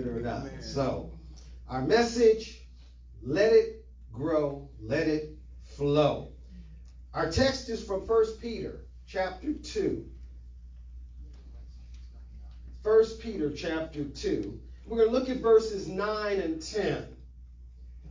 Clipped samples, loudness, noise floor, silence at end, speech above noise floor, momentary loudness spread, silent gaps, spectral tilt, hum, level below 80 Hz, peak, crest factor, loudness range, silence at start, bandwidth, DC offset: under 0.1%; -29 LUFS; -50 dBFS; 0 s; 22 dB; 25 LU; none; -5.5 dB/octave; none; -46 dBFS; -10 dBFS; 20 dB; 9 LU; 0 s; 7.6 kHz; under 0.1%